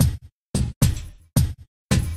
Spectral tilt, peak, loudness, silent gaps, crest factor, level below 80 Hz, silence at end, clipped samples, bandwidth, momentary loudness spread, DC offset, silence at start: -5.5 dB/octave; -4 dBFS; -24 LUFS; 0.32-0.54 s, 0.76-0.81 s, 1.68-1.89 s; 18 dB; -30 dBFS; 0 s; under 0.1%; 15.5 kHz; 14 LU; under 0.1%; 0 s